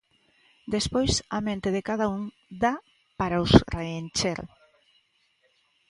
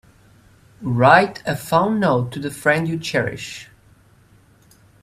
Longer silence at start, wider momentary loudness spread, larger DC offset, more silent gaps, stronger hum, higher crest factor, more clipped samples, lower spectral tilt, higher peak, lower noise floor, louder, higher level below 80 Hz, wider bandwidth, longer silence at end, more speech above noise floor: second, 0.65 s vs 0.8 s; about the same, 17 LU vs 18 LU; neither; neither; neither; first, 28 dB vs 20 dB; neither; about the same, -5 dB/octave vs -6 dB/octave; about the same, 0 dBFS vs 0 dBFS; first, -68 dBFS vs -53 dBFS; second, -26 LUFS vs -18 LUFS; first, -42 dBFS vs -54 dBFS; second, 11.5 kHz vs 15.5 kHz; about the same, 1.45 s vs 1.4 s; first, 43 dB vs 34 dB